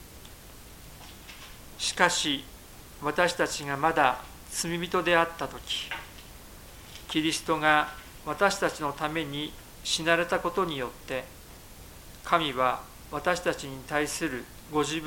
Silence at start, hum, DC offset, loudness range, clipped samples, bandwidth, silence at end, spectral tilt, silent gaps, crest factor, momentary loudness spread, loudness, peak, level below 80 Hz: 0 s; none; under 0.1%; 3 LU; under 0.1%; 17 kHz; 0 s; -3 dB/octave; none; 26 dB; 23 LU; -28 LUFS; -4 dBFS; -52 dBFS